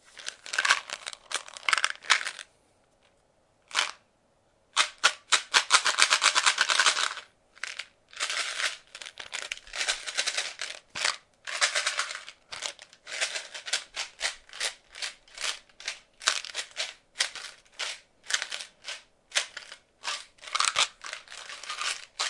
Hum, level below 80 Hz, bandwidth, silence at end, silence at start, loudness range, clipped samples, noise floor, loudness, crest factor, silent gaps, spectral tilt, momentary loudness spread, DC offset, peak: none; -70 dBFS; 11.5 kHz; 0 s; 0.15 s; 9 LU; under 0.1%; -67 dBFS; -28 LUFS; 32 dB; none; 3 dB/octave; 18 LU; under 0.1%; 0 dBFS